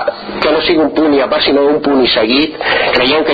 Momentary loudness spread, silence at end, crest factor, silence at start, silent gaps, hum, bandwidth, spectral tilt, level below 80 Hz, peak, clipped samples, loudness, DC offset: 3 LU; 0 s; 10 dB; 0 s; none; none; 5.2 kHz; -6.5 dB/octave; -42 dBFS; 0 dBFS; under 0.1%; -11 LUFS; under 0.1%